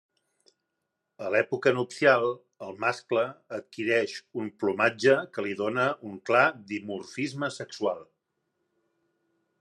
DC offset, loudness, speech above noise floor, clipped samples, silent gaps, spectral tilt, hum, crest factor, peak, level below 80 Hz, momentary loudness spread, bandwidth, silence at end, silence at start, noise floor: under 0.1%; -27 LUFS; 55 dB; under 0.1%; none; -5 dB/octave; none; 22 dB; -6 dBFS; -82 dBFS; 14 LU; 11.5 kHz; 1.6 s; 1.2 s; -82 dBFS